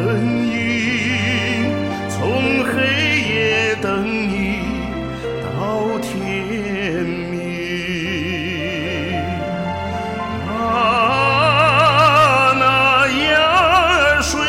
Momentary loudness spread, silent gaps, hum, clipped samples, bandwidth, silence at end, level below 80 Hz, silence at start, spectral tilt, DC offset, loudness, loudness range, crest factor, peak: 11 LU; none; none; under 0.1%; 16.5 kHz; 0 s; -38 dBFS; 0 s; -4.5 dB/octave; under 0.1%; -17 LUFS; 10 LU; 16 dB; -2 dBFS